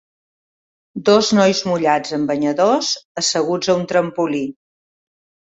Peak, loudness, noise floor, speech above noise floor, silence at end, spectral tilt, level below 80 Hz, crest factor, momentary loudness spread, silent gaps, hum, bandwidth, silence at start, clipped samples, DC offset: -2 dBFS; -17 LUFS; under -90 dBFS; over 73 dB; 1.05 s; -4 dB/octave; -60 dBFS; 16 dB; 7 LU; 3.05-3.15 s; none; 8.4 kHz; 0.95 s; under 0.1%; under 0.1%